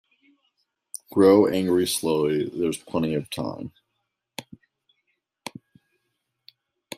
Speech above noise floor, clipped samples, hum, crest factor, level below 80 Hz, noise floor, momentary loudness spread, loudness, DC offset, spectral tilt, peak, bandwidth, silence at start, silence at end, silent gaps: 57 dB; under 0.1%; none; 22 dB; -64 dBFS; -79 dBFS; 23 LU; -22 LUFS; under 0.1%; -5 dB/octave; -4 dBFS; 15.5 kHz; 1.1 s; 2.55 s; none